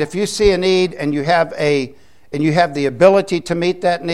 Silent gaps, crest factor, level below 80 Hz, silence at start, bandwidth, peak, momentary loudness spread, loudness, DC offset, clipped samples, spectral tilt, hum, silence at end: none; 16 dB; -38 dBFS; 0 s; 12.5 kHz; 0 dBFS; 8 LU; -16 LUFS; 0.7%; under 0.1%; -5.5 dB/octave; none; 0 s